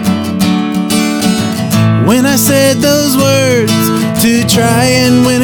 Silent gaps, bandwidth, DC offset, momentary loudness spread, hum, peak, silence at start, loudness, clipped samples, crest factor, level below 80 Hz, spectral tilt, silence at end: none; 19.5 kHz; under 0.1%; 4 LU; none; 0 dBFS; 0 s; -10 LUFS; under 0.1%; 10 dB; -42 dBFS; -4.5 dB/octave; 0 s